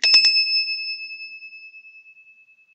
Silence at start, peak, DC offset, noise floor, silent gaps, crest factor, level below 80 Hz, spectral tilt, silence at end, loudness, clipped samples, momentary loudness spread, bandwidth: 0 s; -4 dBFS; under 0.1%; -53 dBFS; none; 20 dB; -86 dBFS; 3.5 dB/octave; 0.85 s; -17 LUFS; under 0.1%; 25 LU; 11.5 kHz